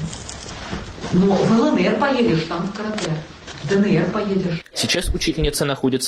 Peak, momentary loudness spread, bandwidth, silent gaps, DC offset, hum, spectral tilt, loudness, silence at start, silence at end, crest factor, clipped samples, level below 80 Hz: -6 dBFS; 14 LU; 13.5 kHz; none; under 0.1%; none; -5 dB/octave; -20 LUFS; 0 s; 0 s; 14 dB; under 0.1%; -36 dBFS